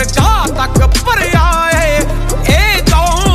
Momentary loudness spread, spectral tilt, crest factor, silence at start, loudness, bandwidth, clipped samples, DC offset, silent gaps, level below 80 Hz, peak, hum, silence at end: 4 LU; -4.5 dB/octave; 10 dB; 0 s; -11 LUFS; 15.5 kHz; under 0.1%; under 0.1%; none; -14 dBFS; 0 dBFS; none; 0 s